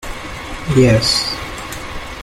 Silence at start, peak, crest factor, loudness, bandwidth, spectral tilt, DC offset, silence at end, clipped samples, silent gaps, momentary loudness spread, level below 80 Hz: 0 s; 0 dBFS; 16 dB; -15 LUFS; 16 kHz; -4.5 dB/octave; under 0.1%; 0 s; under 0.1%; none; 16 LU; -32 dBFS